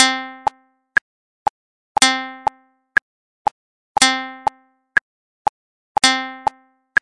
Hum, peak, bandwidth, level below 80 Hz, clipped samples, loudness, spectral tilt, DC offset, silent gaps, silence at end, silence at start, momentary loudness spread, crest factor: none; 0 dBFS; 11.5 kHz; -58 dBFS; under 0.1%; -20 LUFS; 0 dB/octave; under 0.1%; 1.01-1.95 s, 3.02-3.45 s, 3.51-3.95 s, 5.01-5.95 s; 0.6 s; 0 s; 11 LU; 22 dB